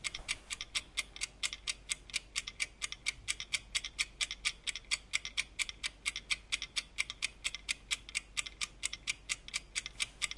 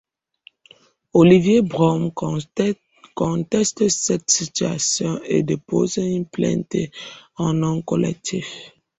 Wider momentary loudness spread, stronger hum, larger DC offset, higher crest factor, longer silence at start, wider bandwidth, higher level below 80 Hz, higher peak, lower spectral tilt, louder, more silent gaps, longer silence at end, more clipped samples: second, 4 LU vs 12 LU; neither; neither; first, 26 dB vs 18 dB; second, 0 s vs 1.15 s; first, 11.5 kHz vs 8.4 kHz; about the same, -58 dBFS vs -54 dBFS; second, -14 dBFS vs -2 dBFS; second, 1.5 dB/octave vs -5 dB/octave; second, -37 LUFS vs -20 LUFS; neither; second, 0 s vs 0.3 s; neither